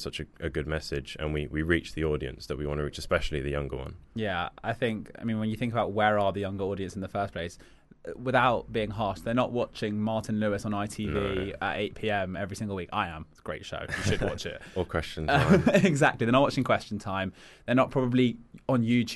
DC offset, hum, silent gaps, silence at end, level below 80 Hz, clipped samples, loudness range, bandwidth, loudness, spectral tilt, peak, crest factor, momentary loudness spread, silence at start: under 0.1%; none; none; 0 s; -46 dBFS; under 0.1%; 7 LU; 12 kHz; -29 LUFS; -6 dB/octave; -8 dBFS; 22 dB; 12 LU; 0 s